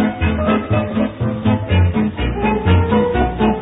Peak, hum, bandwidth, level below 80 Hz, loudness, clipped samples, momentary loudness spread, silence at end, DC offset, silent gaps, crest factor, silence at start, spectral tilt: -4 dBFS; none; 4 kHz; -28 dBFS; -17 LUFS; under 0.1%; 5 LU; 0 s; under 0.1%; none; 12 dB; 0 s; -11 dB/octave